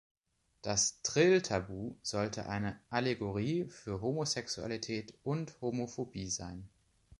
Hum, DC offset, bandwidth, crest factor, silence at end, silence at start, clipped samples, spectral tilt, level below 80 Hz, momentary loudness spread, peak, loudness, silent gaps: none; under 0.1%; 11.5 kHz; 20 dB; 0.5 s; 0.65 s; under 0.1%; -4 dB/octave; -60 dBFS; 11 LU; -16 dBFS; -35 LUFS; none